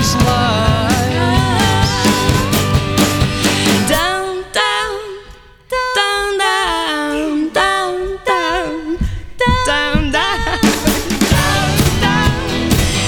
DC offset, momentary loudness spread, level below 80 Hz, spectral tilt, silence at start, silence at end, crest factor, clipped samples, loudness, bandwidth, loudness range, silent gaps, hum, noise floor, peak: under 0.1%; 7 LU; -26 dBFS; -4 dB/octave; 0 s; 0 s; 14 dB; under 0.1%; -14 LUFS; over 20 kHz; 3 LU; none; none; -39 dBFS; 0 dBFS